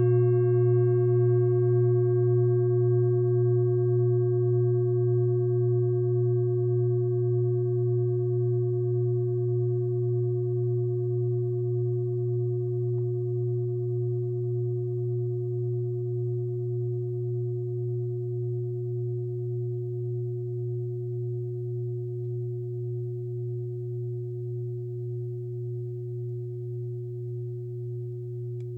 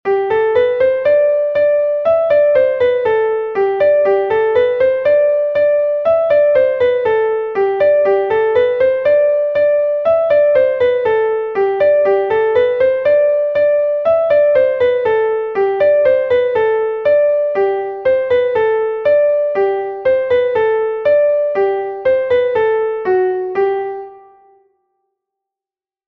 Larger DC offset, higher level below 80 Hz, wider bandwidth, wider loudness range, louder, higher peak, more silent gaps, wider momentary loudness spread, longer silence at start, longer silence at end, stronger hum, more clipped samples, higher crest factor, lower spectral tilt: neither; second, -66 dBFS vs -52 dBFS; second, 1.7 kHz vs 4.9 kHz; first, 10 LU vs 2 LU; second, -28 LUFS vs -14 LUFS; second, -14 dBFS vs -2 dBFS; neither; first, 11 LU vs 5 LU; about the same, 0 s vs 0.05 s; second, 0 s vs 1.9 s; neither; neither; about the same, 12 dB vs 12 dB; first, -14 dB/octave vs -7 dB/octave